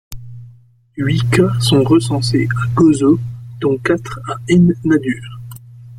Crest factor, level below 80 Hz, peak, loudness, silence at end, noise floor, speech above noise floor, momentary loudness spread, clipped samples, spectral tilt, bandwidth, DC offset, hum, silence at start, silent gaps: 14 dB; -42 dBFS; -2 dBFS; -15 LUFS; 0 s; -45 dBFS; 31 dB; 20 LU; under 0.1%; -6.5 dB/octave; 14 kHz; under 0.1%; none; 0.1 s; none